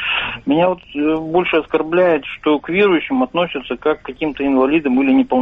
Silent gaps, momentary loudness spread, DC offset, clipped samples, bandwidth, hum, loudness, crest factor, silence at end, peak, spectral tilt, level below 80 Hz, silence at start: none; 6 LU; under 0.1%; under 0.1%; 4.6 kHz; none; -17 LUFS; 12 dB; 0 s; -4 dBFS; -8 dB/octave; -48 dBFS; 0 s